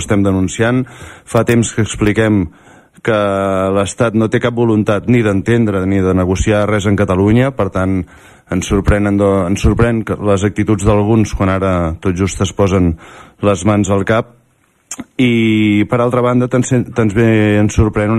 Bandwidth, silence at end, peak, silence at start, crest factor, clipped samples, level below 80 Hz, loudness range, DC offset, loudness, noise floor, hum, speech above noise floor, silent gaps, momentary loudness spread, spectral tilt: 13.5 kHz; 0 s; 0 dBFS; 0 s; 14 dB; under 0.1%; -30 dBFS; 2 LU; under 0.1%; -14 LUFS; -55 dBFS; none; 43 dB; none; 6 LU; -6.5 dB/octave